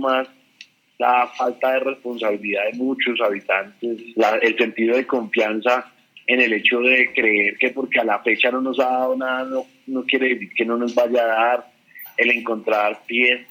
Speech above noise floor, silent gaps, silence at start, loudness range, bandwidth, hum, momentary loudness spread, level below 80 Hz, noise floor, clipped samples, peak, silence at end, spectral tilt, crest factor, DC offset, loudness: 29 dB; none; 0 s; 4 LU; 16 kHz; none; 9 LU; -74 dBFS; -49 dBFS; under 0.1%; -4 dBFS; 0.05 s; -4 dB/octave; 16 dB; under 0.1%; -19 LUFS